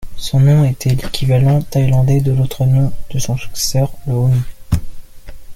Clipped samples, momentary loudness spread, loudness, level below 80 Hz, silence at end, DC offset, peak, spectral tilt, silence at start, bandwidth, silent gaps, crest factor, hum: under 0.1%; 9 LU; -15 LUFS; -30 dBFS; 0 s; under 0.1%; -2 dBFS; -6.5 dB/octave; 0 s; 15.5 kHz; none; 12 dB; none